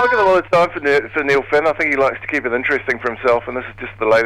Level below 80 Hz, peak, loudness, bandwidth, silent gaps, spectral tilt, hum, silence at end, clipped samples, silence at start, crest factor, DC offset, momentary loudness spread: -46 dBFS; -2 dBFS; -17 LUFS; 12 kHz; none; -5.5 dB/octave; none; 0 s; under 0.1%; 0 s; 14 dB; under 0.1%; 7 LU